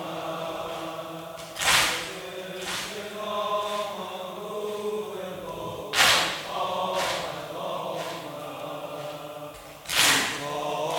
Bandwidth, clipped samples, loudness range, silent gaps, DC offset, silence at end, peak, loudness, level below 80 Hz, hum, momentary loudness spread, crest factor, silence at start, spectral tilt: 19 kHz; under 0.1%; 6 LU; none; under 0.1%; 0 s; -4 dBFS; -27 LUFS; -60 dBFS; none; 16 LU; 26 dB; 0 s; -1.5 dB/octave